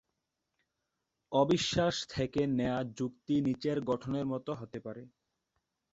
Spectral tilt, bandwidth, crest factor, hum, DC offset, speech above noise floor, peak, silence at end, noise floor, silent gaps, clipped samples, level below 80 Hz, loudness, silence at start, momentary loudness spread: -5.5 dB/octave; 8 kHz; 20 dB; none; under 0.1%; 53 dB; -14 dBFS; 0.85 s; -85 dBFS; none; under 0.1%; -62 dBFS; -33 LUFS; 1.3 s; 13 LU